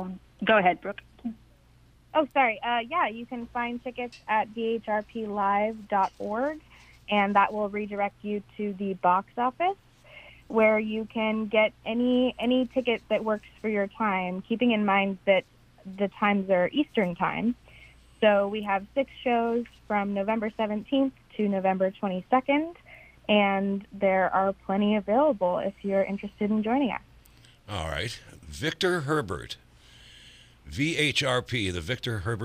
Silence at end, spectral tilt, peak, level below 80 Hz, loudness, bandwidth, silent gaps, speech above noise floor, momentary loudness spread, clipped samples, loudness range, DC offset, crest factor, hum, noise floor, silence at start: 0 s; -5.5 dB/octave; -8 dBFS; -56 dBFS; -27 LUFS; 14 kHz; none; 31 dB; 11 LU; under 0.1%; 4 LU; under 0.1%; 20 dB; none; -58 dBFS; 0 s